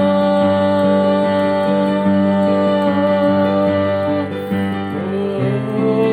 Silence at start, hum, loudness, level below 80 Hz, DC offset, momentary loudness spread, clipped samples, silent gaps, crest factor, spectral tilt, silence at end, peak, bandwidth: 0 s; none; -16 LUFS; -60 dBFS; under 0.1%; 6 LU; under 0.1%; none; 12 dB; -8.5 dB/octave; 0 s; -4 dBFS; 9.4 kHz